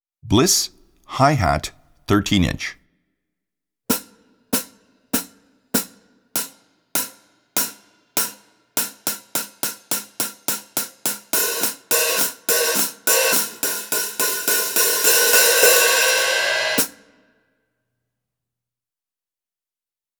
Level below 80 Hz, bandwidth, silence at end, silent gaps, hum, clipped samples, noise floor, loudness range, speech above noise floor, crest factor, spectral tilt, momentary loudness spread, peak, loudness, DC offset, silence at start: -46 dBFS; over 20 kHz; 3.3 s; none; none; under 0.1%; under -90 dBFS; 11 LU; over 72 dB; 20 dB; -2 dB/octave; 13 LU; -2 dBFS; -19 LUFS; under 0.1%; 0.25 s